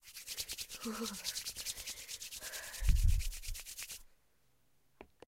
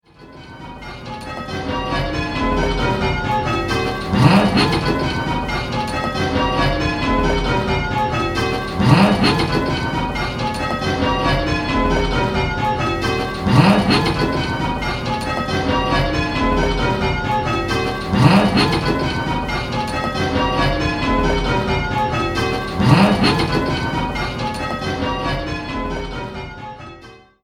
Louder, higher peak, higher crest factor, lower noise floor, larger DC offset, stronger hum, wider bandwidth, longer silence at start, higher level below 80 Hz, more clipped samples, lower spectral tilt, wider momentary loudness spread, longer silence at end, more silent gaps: second, -40 LUFS vs -18 LUFS; second, -16 dBFS vs 0 dBFS; about the same, 22 dB vs 18 dB; first, -76 dBFS vs -42 dBFS; neither; neither; about the same, 16 kHz vs 15 kHz; second, 0.05 s vs 0.2 s; second, -40 dBFS vs -30 dBFS; neither; second, -3 dB/octave vs -6 dB/octave; about the same, 11 LU vs 11 LU; about the same, 0.3 s vs 0.25 s; neither